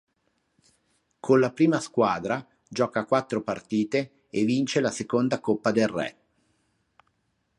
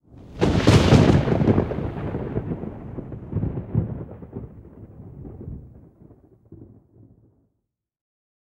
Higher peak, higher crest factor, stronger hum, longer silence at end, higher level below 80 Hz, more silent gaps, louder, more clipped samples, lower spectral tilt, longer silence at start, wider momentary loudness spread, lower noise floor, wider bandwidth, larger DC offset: second, -8 dBFS vs -2 dBFS; about the same, 18 dB vs 22 dB; neither; second, 1.45 s vs 1.9 s; second, -66 dBFS vs -36 dBFS; neither; second, -26 LUFS vs -21 LUFS; neither; second, -5.5 dB/octave vs -7 dB/octave; first, 1.25 s vs 0.15 s; second, 10 LU vs 25 LU; second, -73 dBFS vs -78 dBFS; about the same, 11.5 kHz vs 12.5 kHz; neither